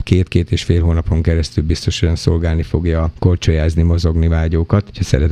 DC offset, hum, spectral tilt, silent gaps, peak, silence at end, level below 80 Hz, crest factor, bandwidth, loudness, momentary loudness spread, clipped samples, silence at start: under 0.1%; none; -7 dB/octave; none; 0 dBFS; 0 s; -22 dBFS; 14 dB; 9.6 kHz; -16 LUFS; 3 LU; under 0.1%; 0 s